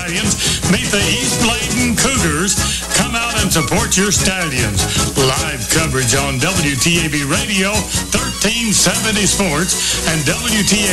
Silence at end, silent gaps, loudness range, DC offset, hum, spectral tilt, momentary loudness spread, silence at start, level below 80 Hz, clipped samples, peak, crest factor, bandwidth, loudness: 0 s; none; 1 LU; under 0.1%; none; -3 dB/octave; 3 LU; 0 s; -30 dBFS; under 0.1%; -2 dBFS; 14 dB; 13.5 kHz; -14 LUFS